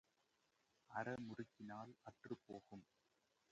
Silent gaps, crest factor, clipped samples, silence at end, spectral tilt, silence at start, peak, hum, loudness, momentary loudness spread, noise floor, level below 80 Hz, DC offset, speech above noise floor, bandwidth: none; 22 dB; under 0.1%; 0.7 s; -7 dB/octave; 0.9 s; -32 dBFS; none; -54 LUFS; 13 LU; -84 dBFS; -86 dBFS; under 0.1%; 31 dB; 8.4 kHz